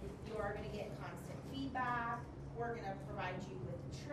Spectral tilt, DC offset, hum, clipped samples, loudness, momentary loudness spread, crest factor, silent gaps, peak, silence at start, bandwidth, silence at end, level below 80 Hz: -6.5 dB/octave; under 0.1%; none; under 0.1%; -44 LUFS; 8 LU; 16 dB; none; -28 dBFS; 0 s; 13 kHz; 0 s; -58 dBFS